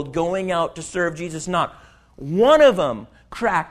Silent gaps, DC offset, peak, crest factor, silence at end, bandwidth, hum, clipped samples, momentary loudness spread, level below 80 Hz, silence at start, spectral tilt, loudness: none; under 0.1%; -2 dBFS; 18 dB; 0 s; 13 kHz; none; under 0.1%; 16 LU; -50 dBFS; 0 s; -5 dB/octave; -20 LUFS